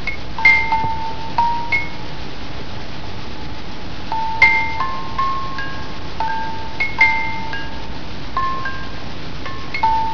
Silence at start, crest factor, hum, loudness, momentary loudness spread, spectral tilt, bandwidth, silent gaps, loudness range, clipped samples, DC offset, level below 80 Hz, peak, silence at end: 0 s; 22 dB; none; -19 LUFS; 18 LU; -4.5 dB/octave; 5.4 kHz; none; 5 LU; under 0.1%; 9%; -36 dBFS; 0 dBFS; 0 s